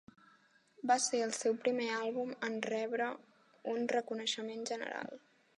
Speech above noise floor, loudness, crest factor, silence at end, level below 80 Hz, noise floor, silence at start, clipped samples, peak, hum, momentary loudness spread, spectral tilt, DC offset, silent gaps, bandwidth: 32 dB; -36 LUFS; 20 dB; 0.4 s; -90 dBFS; -68 dBFS; 0.8 s; under 0.1%; -18 dBFS; none; 11 LU; -2 dB/octave; under 0.1%; none; 10.5 kHz